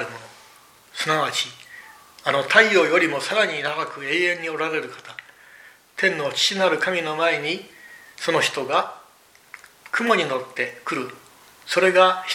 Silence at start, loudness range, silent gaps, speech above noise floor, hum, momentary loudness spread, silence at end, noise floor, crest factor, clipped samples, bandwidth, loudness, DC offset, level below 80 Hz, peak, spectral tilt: 0 s; 4 LU; none; 32 dB; none; 22 LU; 0 s; -53 dBFS; 22 dB; under 0.1%; 16.5 kHz; -21 LUFS; under 0.1%; -74 dBFS; 0 dBFS; -3 dB/octave